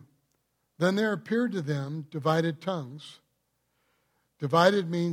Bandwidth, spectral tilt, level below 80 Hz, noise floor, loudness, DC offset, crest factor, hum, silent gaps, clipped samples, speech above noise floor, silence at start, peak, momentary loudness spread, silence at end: 15.5 kHz; -6.5 dB/octave; -74 dBFS; -76 dBFS; -28 LUFS; under 0.1%; 22 dB; none; none; under 0.1%; 49 dB; 0.8 s; -6 dBFS; 14 LU; 0 s